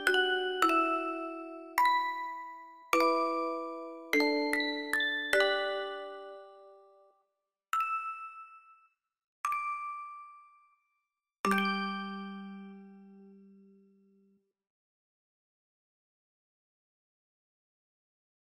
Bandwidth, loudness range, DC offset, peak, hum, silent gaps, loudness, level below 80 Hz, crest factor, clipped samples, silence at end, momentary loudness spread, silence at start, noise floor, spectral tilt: 15.5 kHz; 10 LU; under 0.1%; -10 dBFS; none; 9.27-9.44 s, 11.39-11.44 s; -31 LUFS; -78 dBFS; 26 dB; under 0.1%; 5 s; 19 LU; 0 s; -84 dBFS; -3.5 dB/octave